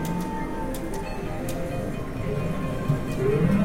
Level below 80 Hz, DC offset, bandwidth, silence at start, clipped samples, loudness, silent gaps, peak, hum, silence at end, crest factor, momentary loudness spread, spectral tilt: -36 dBFS; under 0.1%; 16.5 kHz; 0 s; under 0.1%; -28 LUFS; none; -8 dBFS; none; 0 s; 18 dB; 7 LU; -7 dB/octave